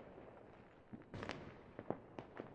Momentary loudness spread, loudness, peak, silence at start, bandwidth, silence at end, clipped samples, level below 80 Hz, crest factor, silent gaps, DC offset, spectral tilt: 11 LU; -53 LUFS; -24 dBFS; 0 s; 9 kHz; 0 s; under 0.1%; -70 dBFS; 30 dB; none; under 0.1%; -6.5 dB/octave